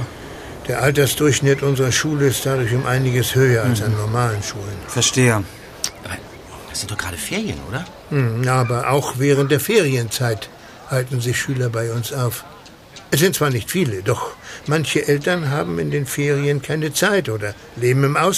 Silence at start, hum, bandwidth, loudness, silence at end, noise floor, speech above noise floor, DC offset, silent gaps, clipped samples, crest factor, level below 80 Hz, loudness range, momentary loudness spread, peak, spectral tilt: 0 s; none; 15.5 kHz; -19 LUFS; 0 s; -41 dBFS; 23 dB; under 0.1%; none; under 0.1%; 18 dB; -46 dBFS; 4 LU; 13 LU; -2 dBFS; -4.5 dB/octave